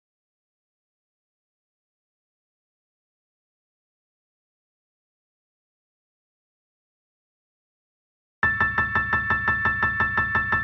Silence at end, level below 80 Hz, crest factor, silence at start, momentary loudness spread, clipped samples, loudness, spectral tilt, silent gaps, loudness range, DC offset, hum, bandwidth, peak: 0 s; -48 dBFS; 22 dB; 8.45 s; 2 LU; under 0.1%; -22 LUFS; -7 dB/octave; none; 7 LU; under 0.1%; none; 7.2 kHz; -8 dBFS